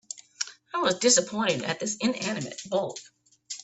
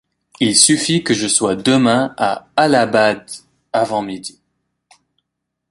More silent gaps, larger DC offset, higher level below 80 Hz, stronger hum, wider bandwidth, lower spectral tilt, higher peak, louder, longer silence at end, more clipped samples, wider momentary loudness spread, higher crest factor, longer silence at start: neither; neither; second, -70 dBFS vs -56 dBFS; neither; second, 8.6 kHz vs 16 kHz; about the same, -2.5 dB/octave vs -3 dB/octave; second, -8 dBFS vs 0 dBFS; second, -27 LUFS vs -15 LUFS; second, 0 s vs 1.4 s; neither; about the same, 15 LU vs 16 LU; about the same, 22 dB vs 18 dB; second, 0.15 s vs 0.4 s